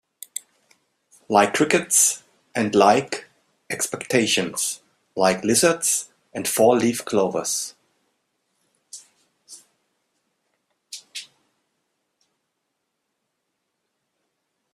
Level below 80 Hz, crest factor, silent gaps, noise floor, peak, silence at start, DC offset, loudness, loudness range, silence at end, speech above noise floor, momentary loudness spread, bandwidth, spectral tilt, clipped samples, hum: -66 dBFS; 24 dB; none; -77 dBFS; 0 dBFS; 1.3 s; under 0.1%; -20 LUFS; 22 LU; 3.5 s; 57 dB; 20 LU; 15.5 kHz; -2.5 dB/octave; under 0.1%; none